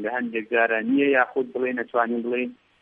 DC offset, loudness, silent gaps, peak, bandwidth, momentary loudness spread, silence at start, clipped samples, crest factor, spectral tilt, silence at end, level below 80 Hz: under 0.1%; -23 LUFS; none; -6 dBFS; 3.8 kHz; 8 LU; 0 s; under 0.1%; 18 dB; -8 dB/octave; 0.25 s; -76 dBFS